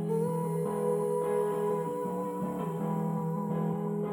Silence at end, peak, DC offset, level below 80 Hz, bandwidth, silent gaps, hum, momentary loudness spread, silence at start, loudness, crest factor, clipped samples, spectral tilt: 0 s; -18 dBFS; under 0.1%; -68 dBFS; 18 kHz; none; none; 4 LU; 0 s; -32 LUFS; 12 dB; under 0.1%; -8.5 dB/octave